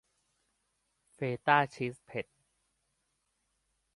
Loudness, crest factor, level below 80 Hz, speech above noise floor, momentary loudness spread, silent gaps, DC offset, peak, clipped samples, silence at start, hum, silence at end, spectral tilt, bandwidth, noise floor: -32 LUFS; 26 dB; -76 dBFS; 48 dB; 14 LU; none; under 0.1%; -10 dBFS; under 0.1%; 1.2 s; none; 1.75 s; -6 dB/octave; 11.5 kHz; -80 dBFS